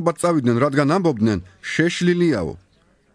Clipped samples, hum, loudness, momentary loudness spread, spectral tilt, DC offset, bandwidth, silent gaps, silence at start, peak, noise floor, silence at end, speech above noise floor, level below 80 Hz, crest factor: under 0.1%; none; -19 LUFS; 8 LU; -6 dB/octave; under 0.1%; 11 kHz; none; 0 s; -4 dBFS; -59 dBFS; 0.6 s; 40 dB; -50 dBFS; 16 dB